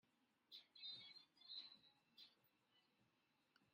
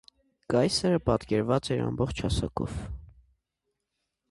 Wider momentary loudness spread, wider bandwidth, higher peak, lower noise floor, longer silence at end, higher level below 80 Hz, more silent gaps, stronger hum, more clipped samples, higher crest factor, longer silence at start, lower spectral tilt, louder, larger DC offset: about the same, 12 LU vs 11 LU; first, 15 kHz vs 11.5 kHz; second, -44 dBFS vs -10 dBFS; about the same, -85 dBFS vs -82 dBFS; second, 0 s vs 1.25 s; second, under -90 dBFS vs -44 dBFS; neither; neither; neither; about the same, 20 dB vs 20 dB; second, 0.05 s vs 0.5 s; second, -1.5 dB/octave vs -6 dB/octave; second, -59 LUFS vs -28 LUFS; neither